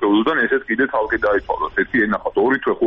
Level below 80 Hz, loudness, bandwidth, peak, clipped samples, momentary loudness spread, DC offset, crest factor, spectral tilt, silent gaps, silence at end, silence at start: -46 dBFS; -18 LUFS; 5.8 kHz; -6 dBFS; under 0.1%; 3 LU; under 0.1%; 12 dB; -7.5 dB/octave; none; 0 s; 0 s